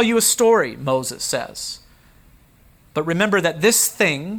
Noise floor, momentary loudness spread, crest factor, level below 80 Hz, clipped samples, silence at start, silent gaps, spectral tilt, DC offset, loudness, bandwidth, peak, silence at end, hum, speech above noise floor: -52 dBFS; 14 LU; 16 dB; -54 dBFS; under 0.1%; 0 s; none; -3 dB/octave; under 0.1%; -18 LUFS; over 20 kHz; -4 dBFS; 0 s; none; 33 dB